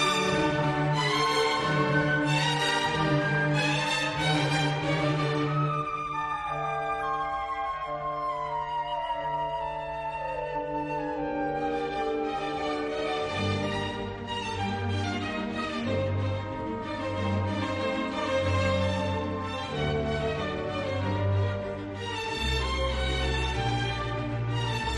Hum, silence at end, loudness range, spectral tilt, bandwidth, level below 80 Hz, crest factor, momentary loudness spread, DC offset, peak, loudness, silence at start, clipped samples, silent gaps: none; 0 s; 6 LU; -5 dB/octave; 12 kHz; -44 dBFS; 16 dB; 7 LU; under 0.1%; -14 dBFS; -29 LUFS; 0 s; under 0.1%; none